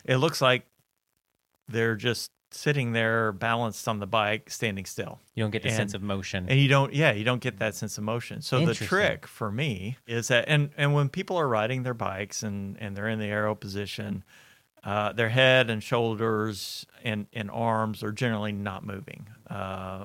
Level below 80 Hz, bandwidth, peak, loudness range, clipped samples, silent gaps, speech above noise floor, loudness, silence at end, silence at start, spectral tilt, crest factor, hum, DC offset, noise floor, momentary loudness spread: -64 dBFS; 16.5 kHz; -6 dBFS; 5 LU; under 0.1%; none; 51 dB; -27 LUFS; 0 s; 0.1 s; -5 dB/octave; 22 dB; none; under 0.1%; -78 dBFS; 12 LU